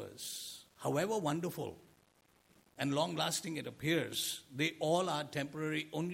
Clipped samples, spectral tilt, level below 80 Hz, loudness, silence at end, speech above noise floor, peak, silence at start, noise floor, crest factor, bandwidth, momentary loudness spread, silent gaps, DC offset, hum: under 0.1%; -4 dB/octave; -76 dBFS; -37 LUFS; 0 s; 34 dB; -18 dBFS; 0 s; -70 dBFS; 18 dB; 16.5 kHz; 9 LU; none; under 0.1%; none